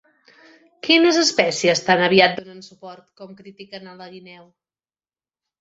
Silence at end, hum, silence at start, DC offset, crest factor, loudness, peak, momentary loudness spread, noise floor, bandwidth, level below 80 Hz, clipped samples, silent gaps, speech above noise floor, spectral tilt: 1.4 s; none; 0.85 s; under 0.1%; 20 dB; -16 LUFS; -2 dBFS; 25 LU; under -90 dBFS; 8 kHz; -66 dBFS; under 0.1%; none; over 70 dB; -3 dB/octave